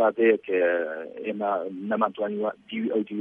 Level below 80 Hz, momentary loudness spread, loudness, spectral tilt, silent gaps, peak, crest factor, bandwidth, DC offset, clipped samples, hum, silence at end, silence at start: -78 dBFS; 10 LU; -26 LUFS; -8.5 dB/octave; none; -8 dBFS; 16 dB; 3.7 kHz; under 0.1%; under 0.1%; none; 0 s; 0 s